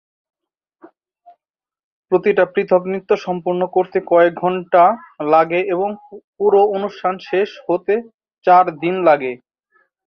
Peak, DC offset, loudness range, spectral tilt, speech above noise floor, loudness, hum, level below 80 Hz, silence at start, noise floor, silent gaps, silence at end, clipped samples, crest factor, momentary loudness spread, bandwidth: 0 dBFS; under 0.1%; 4 LU; -7.5 dB/octave; 72 dB; -17 LUFS; none; -66 dBFS; 2.1 s; -88 dBFS; 6.24-6.33 s, 8.14-8.19 s; 0.7 s; under 0.1%; 16 dB; 9 LU; 6.4 kHz